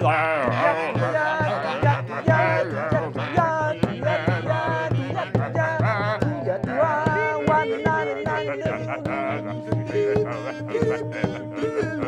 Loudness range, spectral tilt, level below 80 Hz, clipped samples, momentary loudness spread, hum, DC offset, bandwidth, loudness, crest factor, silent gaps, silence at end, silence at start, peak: 3 LU; -7.5 dB/octave; -50 dBFS; under 0.1%; 7 LU; none; under 0.1%; 9.8 kHz; -23 LUFS; 16 dB; none; 0 s; 0 s; -6 dBFS